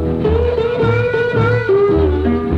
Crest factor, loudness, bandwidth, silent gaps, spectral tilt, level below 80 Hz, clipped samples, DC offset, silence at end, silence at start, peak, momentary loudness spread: 12 dB; -15 LUFS; 6.6 kHz; none; -9 dB/octave; -26 dBFS; under 0.1%; under 0.1%; 0 s; 0 s; -2 dBFS; 3 LU